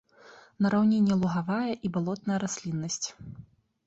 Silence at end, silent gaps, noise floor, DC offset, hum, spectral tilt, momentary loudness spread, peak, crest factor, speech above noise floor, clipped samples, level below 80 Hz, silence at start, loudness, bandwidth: 0.45 s; none; -54 dBFS; under 0.1%; none; -5.5 dB/octave; 10 LU; -14 dBFS; 14 dB; 27 dB; under 0.1%; -64 dBFS; 0.25 s; -28 LUFS; 8 kHz